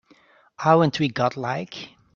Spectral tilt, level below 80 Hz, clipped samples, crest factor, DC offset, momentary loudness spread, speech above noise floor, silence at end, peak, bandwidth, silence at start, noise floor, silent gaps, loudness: -6.5 dB/octave; -62 dBFS; under 0.1%; 20 dB; under 0.1%; 15 LU; 35 dB; 0.3 s; -2 dBFS; 7.4 kHz; 0.6 s; -56 dBFS; none; -22 LUFS